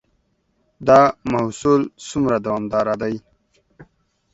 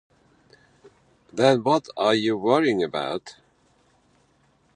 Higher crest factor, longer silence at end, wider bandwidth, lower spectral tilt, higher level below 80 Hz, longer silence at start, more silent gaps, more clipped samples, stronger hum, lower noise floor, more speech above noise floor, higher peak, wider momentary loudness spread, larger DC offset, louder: about the same, 20 dB vs 22 dB; second, 0.5 s vs 1.45 s; second, 8.2 kHz vs 10.5 kHz; about the same, -6.5 dB/octave vs -5.5 dB/octave; first, -52 dBFS vs -68 dBFS; second, 0.8 s vs 1.35 s; neither; neither; neither; about the same, -66 dBFS vs -63 dBFS; first, 48 dB vs 41 dB; first, 0 dBFS vs -4 dBFS; about the same, 12 LU vs 11 LU; neither; first, -19 LUFS vs -22 LUFS